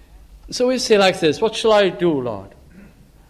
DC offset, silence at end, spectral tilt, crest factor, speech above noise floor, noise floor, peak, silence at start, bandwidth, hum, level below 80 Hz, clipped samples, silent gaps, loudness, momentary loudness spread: under 0.1%; 0.8 s; -4 dB/octave; 16 dB; 29 dB; -46 dBFS; -4 dBFS; 0.15 s; 13.5 kHz; none; -48 dBFS; under 0.1%; none; -17 LUFS; 13 LU